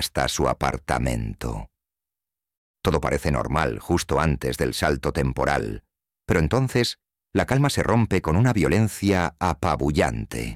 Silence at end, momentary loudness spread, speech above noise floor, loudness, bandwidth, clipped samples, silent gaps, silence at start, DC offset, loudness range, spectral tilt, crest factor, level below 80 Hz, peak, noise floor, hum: 0 s; 8 LU; 67 dB; -23 LUFS; 16 kHz; under 0.1%; 2.57-2.74 s; 0 s; 0.1%; 5 LU; -5.5 dB/octave; 18 dB; -36 dBFS; -6 dBFS; -89 dBFS; none